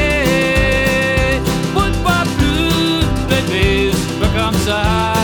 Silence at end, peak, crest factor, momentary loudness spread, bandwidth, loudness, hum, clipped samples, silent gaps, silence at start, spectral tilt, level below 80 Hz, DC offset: 0 s; 0 dBFS; 14 dB; 3 LU; 19.5 kHz; -15 LUFS; none; under 0.1%; none; 0 s; -5 dB/octave; -22 dBFS; under 0.1%